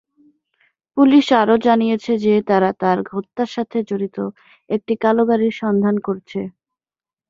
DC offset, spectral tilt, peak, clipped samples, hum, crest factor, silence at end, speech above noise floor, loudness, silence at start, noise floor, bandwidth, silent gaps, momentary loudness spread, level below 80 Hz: under 0.1%; -7 dB/octave; -2 dBFS; under 0.1%; none; 16 dB; 0.8 s; over 73 dB; -18 LUFS; 0.95 s; under -90 dBFS; 7.4 kHz; none; 14 LU; -62 dBFS